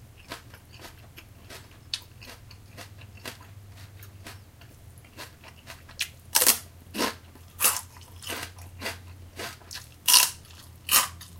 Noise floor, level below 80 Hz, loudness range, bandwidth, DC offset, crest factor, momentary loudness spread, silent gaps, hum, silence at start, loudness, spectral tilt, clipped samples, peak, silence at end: -50 dBFS; -56 dBFS; 20 LU; 17 kHz; under 0.1%; 32 dB; 27 LU; none; none; 0 s; -24 LUFS; 0 dB/octave; under 0.1%; 0 dBFS; 0 s